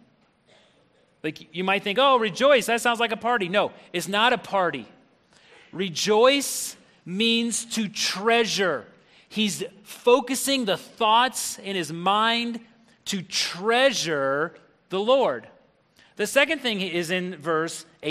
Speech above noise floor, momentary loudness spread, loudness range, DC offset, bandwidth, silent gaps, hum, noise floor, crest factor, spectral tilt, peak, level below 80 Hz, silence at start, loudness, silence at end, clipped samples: 38 dB; 13 LU; 3 LU; under 0.1%; 15 kHz; none; none; -62 dBFS; 20 dB; -3 dB/octave; -4 dBFS; -70 dBFS; 1.25 s; -23 LUFS; 0 s; under 0.1%